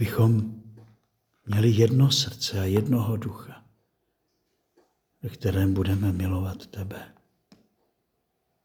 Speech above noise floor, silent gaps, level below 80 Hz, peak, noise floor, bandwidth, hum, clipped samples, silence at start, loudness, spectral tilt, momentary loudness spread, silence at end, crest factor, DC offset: 52 dB; none; -56 dBFS; -6 dBFS; -76 dBFS; 19.5 kHz; none; under 0.1%; 0 s; -24 LUFS; -6 dB/octave; 19 LU; 1.6 s; 20 dB; under 0.1%